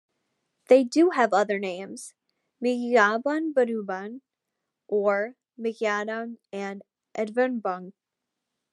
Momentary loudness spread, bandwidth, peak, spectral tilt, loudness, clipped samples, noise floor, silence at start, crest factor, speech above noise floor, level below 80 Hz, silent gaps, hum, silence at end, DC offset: 17 LU; 12 kHz; -6 dBFS; -5 dB/octave; -25 LUFS; under 0.1%; -85 dBFS; 0.7 s; 22 dB; 60 dB; under -90 dBFS; none; none; 0.85 s; under 0.1%